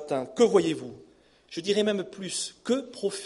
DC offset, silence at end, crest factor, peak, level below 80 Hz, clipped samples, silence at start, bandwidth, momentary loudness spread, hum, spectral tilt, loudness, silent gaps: under 0.1%; 0 s; 18 dB; -10 dBFS; -70 dBFS; under 0.1%; 0 s; 11.5 kHz; 13 LU; none; -4 dB/octave; -27 LUFS; none